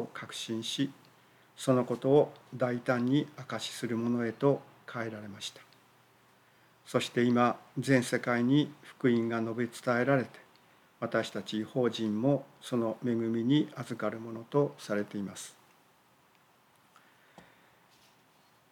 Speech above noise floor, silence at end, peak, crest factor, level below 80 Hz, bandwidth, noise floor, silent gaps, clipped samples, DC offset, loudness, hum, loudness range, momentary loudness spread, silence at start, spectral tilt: 34 dB; 3.2 s; -12 dBFS; 20 dB; -84 dBFS; 16 kHz; -65 dBFS; none; under 0.1%; under 0.1%; -31 LUFS; none; 7 LU; 12 LU; 0 s; -6 dB/octave